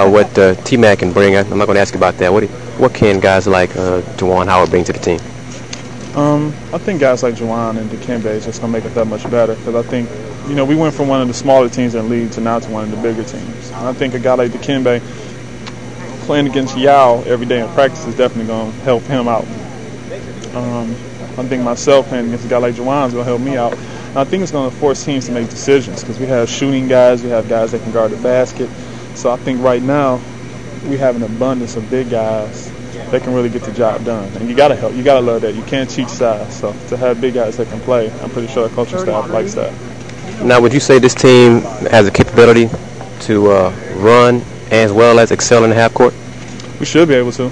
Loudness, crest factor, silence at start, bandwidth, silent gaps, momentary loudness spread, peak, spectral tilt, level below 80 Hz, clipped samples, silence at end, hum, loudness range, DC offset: -13 LUFS; 14 dB; 0 s; 10.5 kHz; none; 16 LU; 0 dBFS; -5.5 dB/octave; -42 dBFS; 0.3%; 0 s; none; 8 LU; 2%